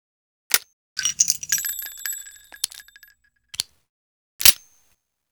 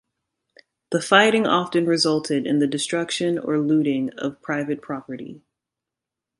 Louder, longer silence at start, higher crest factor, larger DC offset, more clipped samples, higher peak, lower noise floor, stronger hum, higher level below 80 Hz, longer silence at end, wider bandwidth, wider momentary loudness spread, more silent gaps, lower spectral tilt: about the same, -20 LUFS vs -21 LUFS; second, 0.5 s vs 0.9 s; about the same, 26 dB vs 22 dB; neither; neither; about the same, 0 dBFS vs 0 dBFS; second, -67 dBFS vs -86 dBFS; neither; first, -56 dBFS vs -68 dBFS; second, 0.75 s vs 1 s; first, over 20 kHz vs 11.5 kHz; first, 19 LU vs 14 LU; first, 0.73-0.96 s, 3.89-4.39 s vs none; second, 2.5 dB/octave vs -4.5 dB/octave